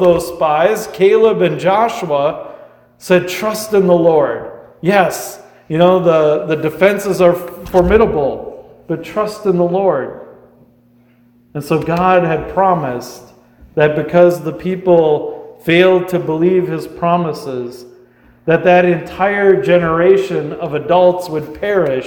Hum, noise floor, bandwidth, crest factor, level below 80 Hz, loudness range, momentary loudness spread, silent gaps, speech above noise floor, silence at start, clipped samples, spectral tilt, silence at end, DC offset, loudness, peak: none; -50 dBFS; over 20 kHz; 14 dB; -40 dBFS; 4 LU; 14 LU; none; 37 dB; 0 s; under 0.1%; -6.5 dB/octave; 0 s; under 0.1%; -14 LUFS; 0 dBFS